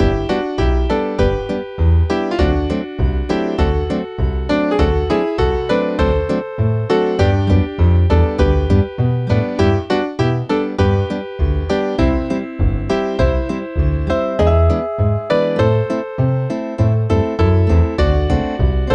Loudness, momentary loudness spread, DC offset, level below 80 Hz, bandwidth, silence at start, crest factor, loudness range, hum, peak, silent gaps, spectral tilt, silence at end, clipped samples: -17 LUFS; 5 LU; under 0.1%; -22 dBFS; 7.8 kHz; 0 s; 14 dB; 3 LU; none; -2 dBFS; none; -8 dB/octave; 0 s; under 0.1%